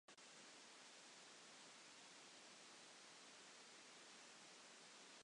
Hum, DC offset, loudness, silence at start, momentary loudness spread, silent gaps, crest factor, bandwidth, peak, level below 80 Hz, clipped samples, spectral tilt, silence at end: none; under 0.1%; -62 LUFS; 0.1 s; 0 LU; none; 14 dB; 11 kHz; -50 dBFS; under -90 dBFS; under 0.1%; -0.5 dB/octave; 0 s